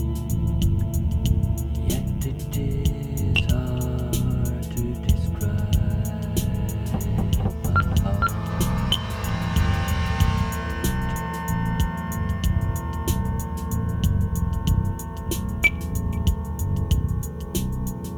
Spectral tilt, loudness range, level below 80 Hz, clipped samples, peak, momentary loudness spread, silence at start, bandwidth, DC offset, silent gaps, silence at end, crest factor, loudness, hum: -5.5 dB/octave; 2 LU; -28 dBFS; under 0.1%; -6 dBFS; 5 LU; 0 s; over 20 kHz; under 0.1%; none; 0 s; 18 dB; -25 LUFS; none